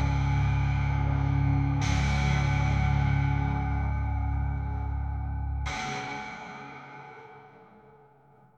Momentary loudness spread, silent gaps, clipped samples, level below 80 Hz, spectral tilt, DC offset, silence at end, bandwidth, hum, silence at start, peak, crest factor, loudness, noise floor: 15 LU; none; under 0.1%; -34 dBFS; -6.5 dB/octave; under 0.1%; 0.95 s; 8 kHz; none; 0 s; -14 dBFS; 14 dB; -28 LUFS; -58 dBFS